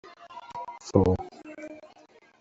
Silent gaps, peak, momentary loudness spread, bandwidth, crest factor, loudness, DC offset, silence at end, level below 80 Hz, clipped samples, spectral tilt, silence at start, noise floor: none; -6 dBFS; 22 LU; 8 kHz; 24 dB; -27 LUFS; under 0.1%; 0.55 s; -54 dBFS; under 0.1%; -7.5 dB/octave; 0.05 s; -57 dBFS